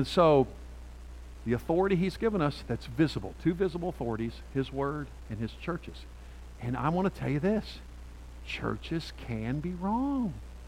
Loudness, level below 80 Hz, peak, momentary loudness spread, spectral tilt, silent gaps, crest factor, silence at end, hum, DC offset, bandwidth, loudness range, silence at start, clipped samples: -31 LUFS; -46 dBFS; -10 dBFS; 20 LU; -7.5 dB/octave; none; 20 dB; 0 s; none; under 0.1%; 16 kHz; 4 LU; 0 s; under 0.1%